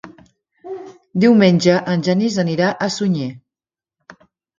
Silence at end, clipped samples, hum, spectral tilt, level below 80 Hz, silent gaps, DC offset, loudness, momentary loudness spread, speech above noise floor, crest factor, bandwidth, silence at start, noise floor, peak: 1.2 s; under 0.1%; none; -6 dB/octave; -60 dBFS; none; under 0.1%; -16 LUFS; 21 LU; over 75 dB; 18 dB; 7.6 kHz; 0.05 s; under -90 dBFS; 0 dBFS